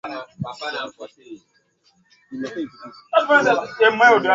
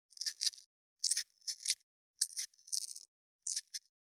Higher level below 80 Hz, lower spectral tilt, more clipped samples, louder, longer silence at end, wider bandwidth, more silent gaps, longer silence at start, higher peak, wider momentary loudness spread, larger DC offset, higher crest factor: first, -64 dBFS vs under -90 dBFS; first, -4.5 dB/octave vs 7.5 dB/octave; neither; first, -18 LUFS vs -38 LUFS; second, 0 s vs 0.3 s; second, 7.8 kHz vs over 20 kHz; second, none vs 0.66-0.96 s, 1.83-2.14 s, 3.08-3.39 s; second, 0.05 s vs 0.2 s; first, -2 dBFS vs -12 dBFS; first, 20 LU vs 11 LU; neither; second, 18 dB vs 30 dB